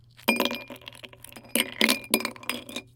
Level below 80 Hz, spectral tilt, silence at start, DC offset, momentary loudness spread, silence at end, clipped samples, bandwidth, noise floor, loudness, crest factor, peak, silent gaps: -64 dBFS; -1.5 dB/octave; 0.2 s; under 0.1%; 21 LU; 0.15 s; under 0.1%; 17 kHz; -47 dBFS; -26 LUFS; 30 dB; 0 dBFS; none